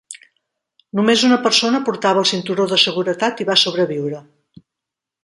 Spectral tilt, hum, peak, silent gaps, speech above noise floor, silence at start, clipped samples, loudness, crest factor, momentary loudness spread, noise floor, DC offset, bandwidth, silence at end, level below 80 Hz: -3.5 dB/octave; none; 0 dBFS; none; 67 dB; 0.1 s; under 0.1%; -16 LUFS; 18 dB; 13 LU; -84 dBFS; under 0.1%; 11.5 kHz; 1.05 s; -66 dBFS